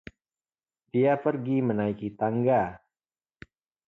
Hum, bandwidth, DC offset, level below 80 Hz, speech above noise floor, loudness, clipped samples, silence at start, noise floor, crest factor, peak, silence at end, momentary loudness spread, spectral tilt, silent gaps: none; 5.2 kHz; under 0.1%; -62 dBFS; over 65 dB; -27 LUFS; under 0.1%; 0.95 s; under -90 dBFS; 18 dB; -10 dBFS; 1.1 s; 7 LU; -10.5 dB/octave; none